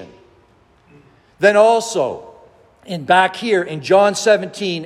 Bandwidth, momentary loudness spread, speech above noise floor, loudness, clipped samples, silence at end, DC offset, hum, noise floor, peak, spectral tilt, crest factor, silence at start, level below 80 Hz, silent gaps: 14 kHz; 12 LU; 38 dB; -15 LUFS; under 0.1%; 0 s; under 0.1%; none; -53 dBFS; 0 dBFS; -4 dB/octave; 16 dB; 0 s; -62 dBFS; none